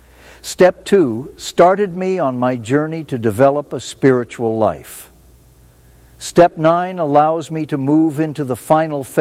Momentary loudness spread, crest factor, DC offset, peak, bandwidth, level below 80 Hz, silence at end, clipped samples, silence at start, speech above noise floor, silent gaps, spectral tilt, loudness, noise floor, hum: 11 LU; 16 dB; under 0.1%; 0 dBFS; 16 kHz; -50 dBFS; 0 s; under 0.1%; 0.45 s; 32 dB; none; -6 dB/octave; -16 LUFS; -47 dBFS; none